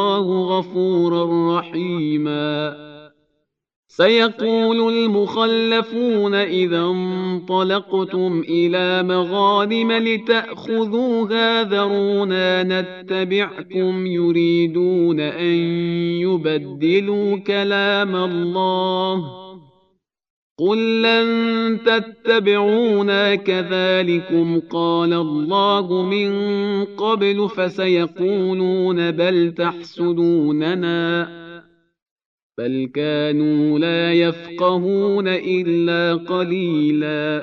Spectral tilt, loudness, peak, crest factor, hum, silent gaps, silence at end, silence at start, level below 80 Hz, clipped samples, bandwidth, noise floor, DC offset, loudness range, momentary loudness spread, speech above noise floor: -7.5 dB/octave; -18 LUFS; -2 dBFS; 16 dB; none; 3.76-3.83 s, 20.30-20.56 s, 32.02-32.16 s, 32.25-32.50 s; 0 s; 0 s; -70 dBFS; under 0.1%; 6.4 kHz; -71 dBFS; under 0.1%; 4 LU; 6 LU; 53 dB